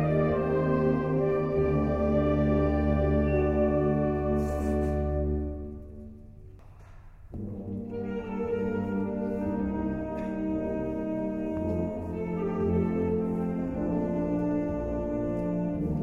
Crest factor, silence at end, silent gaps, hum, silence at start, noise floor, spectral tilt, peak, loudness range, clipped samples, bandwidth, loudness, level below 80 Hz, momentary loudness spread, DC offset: 14 dB; 0 s; none; none; 0 s; -48 dBFS; -10 dB/octave; -14 dBFS; 9 LU; under 0.1%; 8.4 kHz; -29 LUFS; -38 dBFS; 9 LU; under 0.1%